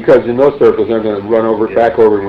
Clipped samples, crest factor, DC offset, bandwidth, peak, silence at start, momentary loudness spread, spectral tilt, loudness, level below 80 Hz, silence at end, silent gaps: under 0.1%; 10 dB; under 0.1%; 5.6 kHz; 0 dBFS; 0 s; 5 LU; -8.5 dB/octave; -11 LUFS; -44 dBFS; 0 s; none